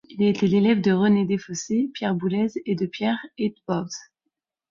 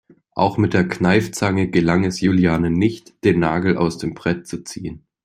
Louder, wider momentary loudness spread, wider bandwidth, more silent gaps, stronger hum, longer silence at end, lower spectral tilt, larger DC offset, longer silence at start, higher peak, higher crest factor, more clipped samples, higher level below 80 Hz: second, -23 LUFS vs -19 LUFS; about the same, 10 LU vs 12 LU; second, 7.4 kHz vs 14 kHz; neither; neither; first, 0.7 s vs 0.25 s; about the same, -6 dB/octave vs -6.5 dB/octave; neither; second, 0.1 s vs 0.35 s; second, -8 dBFS vs -2 dBFS; about the same, 14 dB vs 18 dB; neither; second, -62 dBFS vs -46 dBFS